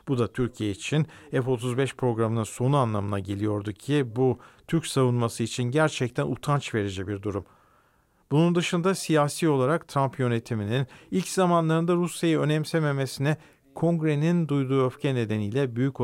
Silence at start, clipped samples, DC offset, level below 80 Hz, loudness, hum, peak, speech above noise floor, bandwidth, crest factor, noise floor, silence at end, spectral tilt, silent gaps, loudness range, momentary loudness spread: 0.05 s; under 0.1%; under 0.1%; -58 dBFS; -26 LUFS; none; -10 dBFS; 39 dB; 16 kHz; 16 dB; -65 dBFS; 0 s; -6.5 dB/octave; none; 2 LU; 6 LU